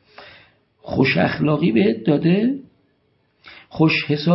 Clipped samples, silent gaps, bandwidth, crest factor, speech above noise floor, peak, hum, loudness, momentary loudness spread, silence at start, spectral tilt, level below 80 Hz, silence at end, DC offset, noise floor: under 0.1%; none; 5.8 kHz; 18 dB; 47 dB; -2 dBFS; none; -18 LUFS; 8 LU; 0.2 s; -10.5 dB/octave; -54 dBFS; 0 s; under 0.1%; -64 dBFS